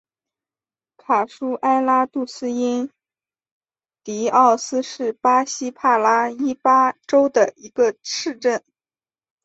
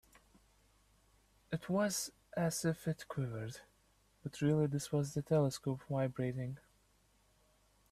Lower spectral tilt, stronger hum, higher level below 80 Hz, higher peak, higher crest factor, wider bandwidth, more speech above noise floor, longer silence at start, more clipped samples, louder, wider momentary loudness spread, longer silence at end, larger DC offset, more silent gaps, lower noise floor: second, -3 dB/octave vs -6 dB/octave; neither; about the same, -70 dBFS vs -68 dBFS; first, -2 dBFS vs -22 dBFS; about the same, 18 dB vs 18 dB; second, 8.2 kHz vs 15.5 kHz; first, over 71 dB vs 35 dB; second, 1.1 s vs 1.5 s; neither; first, -19 LUFS vs -37 LUFS; about the same, 10 LU vs 12 LU; second, 0.85 s vs 1.3 s; neither; first, 3.52-3.61 s vs none; first, under -90 dBFS vs -72 dBFS